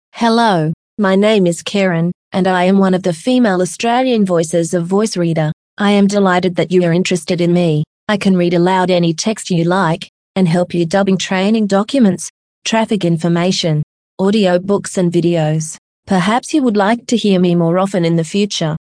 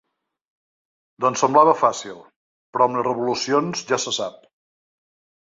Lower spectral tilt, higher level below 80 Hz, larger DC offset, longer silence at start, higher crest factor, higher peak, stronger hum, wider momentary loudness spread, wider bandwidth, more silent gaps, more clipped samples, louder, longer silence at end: first, -5.5 dB/octave vs -3.5 dB/octave; first, -56 dBFS vs -68 dBFS; neither; second, 0.15 s vs 1.2 s; second, 14 dB vs 20 dB; about the same, 0 dBFS vs -2 dBFS; neither; second, 6 LU vs 16 LU; first, 10.5 kHz vs 8 kHz; first, 0.73-0.97 s, 2.15-2.31 s, 5.53-5.77 s, 7.87-8.07 s, 10.09-10.34 s, 12.30-12.62 s, 13.83-14.18 s, 15.78-16.03 s vs 2.36-2.73 s; neither; first, -14 LUFS vs -20 LUFS; second, 0.1 s vs 1.2 s